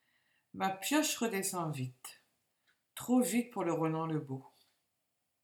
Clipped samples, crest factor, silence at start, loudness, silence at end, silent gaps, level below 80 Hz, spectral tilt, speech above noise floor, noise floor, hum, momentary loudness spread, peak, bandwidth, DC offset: under 0.1%; 18 dB; 0.55 s; -34 LUFS; 0.95 s; none; -84 dBFS; -4.5 dB/octave; 49 dB; -83 dBFS; none; 17 LU; -20 dBFS; 19 kHz; under 0.1%